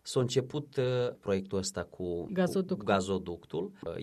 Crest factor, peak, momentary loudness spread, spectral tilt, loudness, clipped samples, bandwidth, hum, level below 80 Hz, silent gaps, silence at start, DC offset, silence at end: 18 dB; -14 dBFS; 8 LU; -5.5 dB/octave; -33 LUFS; under 0.1%; 13.5 kHz; none; -62 dBFS; none; 0.05 s; under 0.1%; 0 s